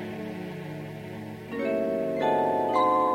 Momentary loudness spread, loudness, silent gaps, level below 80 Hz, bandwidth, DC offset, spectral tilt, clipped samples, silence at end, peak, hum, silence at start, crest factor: 15 LU; -28 LUFS; none; -64 dBFS; 16 kHz; under 0.1%; -7 dB/octave; under 0.1%; 0 s; -12 dBFS; none; 0 s; 16 dB